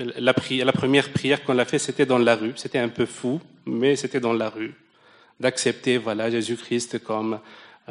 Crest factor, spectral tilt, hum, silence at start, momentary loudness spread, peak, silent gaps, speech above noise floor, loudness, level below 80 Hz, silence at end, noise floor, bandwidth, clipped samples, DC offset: 18 dB; -4.5 dB/octave; none; 0 s; 9 LU; -4 dBFS; none; 32 dB; -23 LUFS; -66 dBFS; 0.25 s; -55 dBFS; 10.5 kHz; under 0.1%; under 0.1%